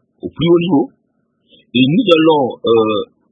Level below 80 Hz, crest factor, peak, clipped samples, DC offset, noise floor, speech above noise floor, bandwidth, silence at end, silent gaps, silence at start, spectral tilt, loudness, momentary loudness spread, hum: -52 dBFS; 14 dB; 0 dBFS; under 0.1%; under 0.1%; -64 dBFS; 51 dB; 5.4 kHz; 0.25 s; none; 0.25 s; -8 dB/octave; -13 LUFS; 10 LU; none